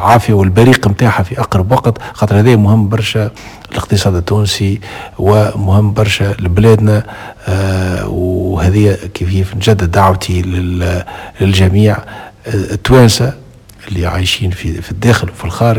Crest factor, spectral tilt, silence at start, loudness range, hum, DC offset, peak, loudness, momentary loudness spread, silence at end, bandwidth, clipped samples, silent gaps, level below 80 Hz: 10 dB; -6 dB/octave; 0 s; 2 LU; none; under 0.1%; 0 dBFS; -12 LUFS; 12 LU; 0 s; 16 kHz; 0.6%; none; -24 dBFS